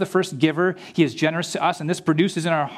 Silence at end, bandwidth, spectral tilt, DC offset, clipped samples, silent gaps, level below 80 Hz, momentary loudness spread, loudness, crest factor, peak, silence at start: 0 s; 14 kHz; -5.5 dB/octave; under 0.1%; under 0.1%; none; -70 dBFS; 3 LU; -22 LUFS; 18 dB; -2 dBFS; 0 s